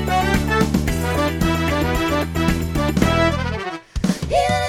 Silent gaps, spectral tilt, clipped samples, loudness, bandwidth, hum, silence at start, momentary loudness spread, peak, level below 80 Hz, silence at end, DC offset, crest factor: none; -5.5 dB/octave; under 0.1%; -20 LUFS; 19.5 kHz; none; 0 s; 6 LU; -2 dBFS; -28 dBFS; 0 s; under 0.1%; 18 dB